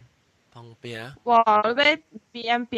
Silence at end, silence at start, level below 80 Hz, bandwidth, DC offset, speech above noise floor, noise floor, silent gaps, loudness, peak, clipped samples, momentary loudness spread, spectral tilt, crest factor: 0 s; 0.55 s; -70 dBFS; 11 kHz; under 0.1%; 40 dB; -63 dBFS; none; -21 LUFS; -6 dBFS; under 0.1%; 20 LU; -4 dB/octave; 18 dB